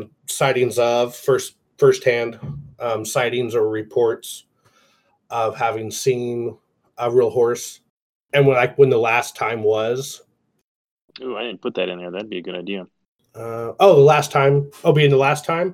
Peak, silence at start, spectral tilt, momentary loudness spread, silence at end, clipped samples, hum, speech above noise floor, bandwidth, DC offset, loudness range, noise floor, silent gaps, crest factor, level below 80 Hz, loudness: -2 dBFS; 0 s; -5 dB/octave; 16 LU; 0 s; under 0.1%; none; 43 dB; 16 kHz; under 0.1%; 8 LU; -61 dBFS; 7.90-8.26 s, 10.64-10.97 s, 11.04-11.08 s, 13.08-13.19 s; 18 dB; -64 dBFS; -19 LUFS